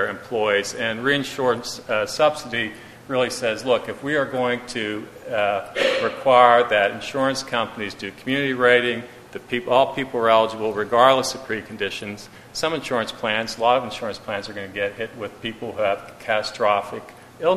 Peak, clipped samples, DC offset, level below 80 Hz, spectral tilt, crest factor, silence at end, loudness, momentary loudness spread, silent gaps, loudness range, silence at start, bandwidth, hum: 0 dBFS; under 0.1%; under 0.1%; -58 dBFS; -3.5 dB/octave; 22 dB; 0 s; -22 LUFS; 14 LU; none; 6 LU; 0 s; 14 kHz; none